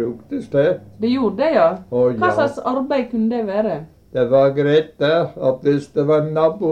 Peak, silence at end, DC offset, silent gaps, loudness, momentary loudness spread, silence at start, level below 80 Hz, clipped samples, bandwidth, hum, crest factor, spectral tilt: -4 dBFS; 0 s; under 0.1%; none; -18 LUFS; 7 LU; 0 s; -56 dBFS; under 0.1%; 9.4 kHz; none; 14 dB; -8 dB/octave